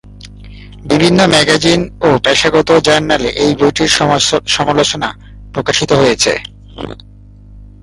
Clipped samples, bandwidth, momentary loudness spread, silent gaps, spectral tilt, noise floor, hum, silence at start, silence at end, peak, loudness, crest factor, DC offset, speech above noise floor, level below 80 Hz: under 0.1%; 11.5 kHz; 15 LU; none; -3.5 dB/octave; -36 dBFS; 50 Hz at -35 dBFS; 0.05 s; 0.15 s; 0 dBFS; -11 LUFS; 12 dB; under 0.1%; 25 dB; -36 dBFS